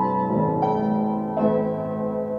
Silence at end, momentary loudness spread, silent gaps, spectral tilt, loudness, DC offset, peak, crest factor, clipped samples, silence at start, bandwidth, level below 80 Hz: 0 s; 5 LU; none; -10.5 dB/octave; -23 LUFS; under 0.1%; -10 dBFS; 14 dB; under 0.1%; 0 s; 5 kHz; -56 dBFS